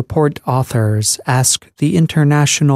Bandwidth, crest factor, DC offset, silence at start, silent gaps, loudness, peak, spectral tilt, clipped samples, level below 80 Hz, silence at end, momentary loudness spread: 15 kHz; 12 dB; under 0.1%; 0 s; none; -14 LUFS; 0 dBFS; -4.5 dB/octave; under 0.1%; -48 dBFS; 0 s; 4 LU